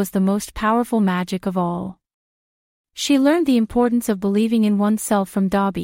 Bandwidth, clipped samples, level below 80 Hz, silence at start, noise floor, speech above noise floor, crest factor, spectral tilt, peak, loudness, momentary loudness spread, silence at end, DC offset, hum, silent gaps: 16.5 kHz; under 0.1%; -48 dBFS; 0 s; under -90 dBFS; over 71 dB; 14 dB; -5.5 dB/octave; -4 dBFS; -19 LUFS; 7 LU; 0 s; under 0.1%; none; 2.14-2.84 s